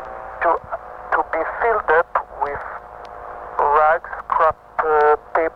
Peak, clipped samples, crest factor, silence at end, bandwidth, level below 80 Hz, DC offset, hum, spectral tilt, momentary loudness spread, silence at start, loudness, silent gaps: -4 dBFS; under 0.1%; 16 dB; 0 s; 6 kHz; -48 dBFS; under 0.1%; none; -6.5 dB/octave; 17 LU; 0 s; -19 LUFS; none